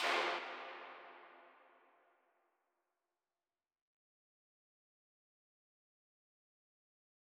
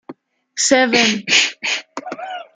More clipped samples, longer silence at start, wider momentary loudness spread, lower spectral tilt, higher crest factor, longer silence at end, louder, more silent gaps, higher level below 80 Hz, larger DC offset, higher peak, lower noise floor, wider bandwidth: neither; about the same, 0 s vs 0.1 s; first, 24 LU vs 17 LU; about the same, -0.5 dB/octave vs -1 dB/octave; first, 26 dB vs 18 dB; first, 5.8 s vs 0.15 s; second, -41 LUFS vs -15 LUFS; neither; second, under -90 dBFS vs -62 dBFS; neither; second, -22 dBFS vs 0 dBFS; first, under -90 dBFS vs -40 dBFS; first, 11.5 kHz vs 10 kHz